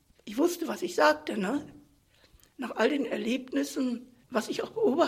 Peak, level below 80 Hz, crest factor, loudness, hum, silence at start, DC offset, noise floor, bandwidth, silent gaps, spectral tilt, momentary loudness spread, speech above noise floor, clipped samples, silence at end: -8 dBFS; -68 dBFS; 22 dB; -30 LUFS; none; 0.25 s; under 0.1%; -63 dBFS; 16 kHz; none; -4 dB/octave; 13 LU; 34 dB; under 0.1%; 0 s